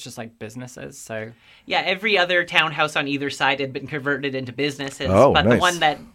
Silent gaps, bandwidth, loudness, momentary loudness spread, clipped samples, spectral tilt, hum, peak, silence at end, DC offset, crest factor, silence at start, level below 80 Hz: none; 16 kHz; -20 LUFS; 19 LU; under 0.1%; -4.5 dB/octave; none; 0 dBFS; 0.05 s; under 0.1%; 22 dB; 0 s; -48 dBFS